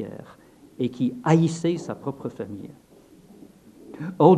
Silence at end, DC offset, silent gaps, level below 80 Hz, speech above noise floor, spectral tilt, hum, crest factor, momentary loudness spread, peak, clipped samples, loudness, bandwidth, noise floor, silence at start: 0 s; under 0.1%; none; -64 dBFS; 28 dB; -7.5 dB/octave; none; 24 dB; 20 LU; -2 dBFS; under 0.1%; -25 LUFS; 10 kHz; -51 dBFS; 0 s